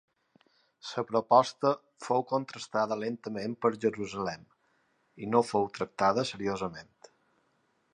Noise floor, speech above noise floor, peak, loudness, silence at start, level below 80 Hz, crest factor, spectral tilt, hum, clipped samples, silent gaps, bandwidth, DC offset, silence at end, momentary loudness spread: -73 dBFS; 43 dB; -8 dBFS; -30 LUFS; 0.85 s; -70 dBFS; 24 dB; -5.5 dB/octave; none; under 0.1%; none; 10.5 kHz; under 0.1%; 1.1 s; 13 LU